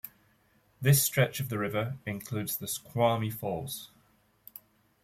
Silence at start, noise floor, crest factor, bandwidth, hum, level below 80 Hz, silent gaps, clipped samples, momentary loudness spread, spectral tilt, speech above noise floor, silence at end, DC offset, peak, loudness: 0.05 s; -67 dBFS; 20 dB; 16.5 kHz; none; -64 dBFS; none; under 0.1%; 25 LU; -4.5 dB/octave; 37 dB; 1.2 s; under 0.1%; -12 dBFS; -30 LUFS